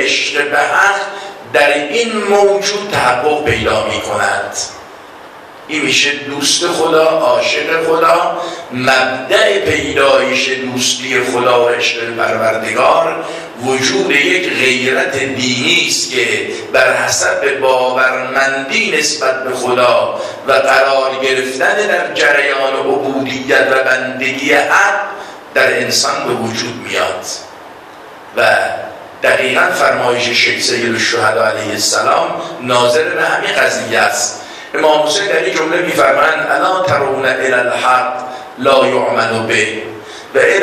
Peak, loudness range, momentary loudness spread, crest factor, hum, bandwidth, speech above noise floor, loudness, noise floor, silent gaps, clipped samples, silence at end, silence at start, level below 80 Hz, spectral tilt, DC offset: 0 dBFS; 3 LU; 8 LU; 14 dB; none; 14.5 kHz; 21 dB; -12 LUFS; -34 dBFS; none; under 0.1%; 0 s; 0 s; -50 dBFS; -2.5 dB/octave; under 0.1%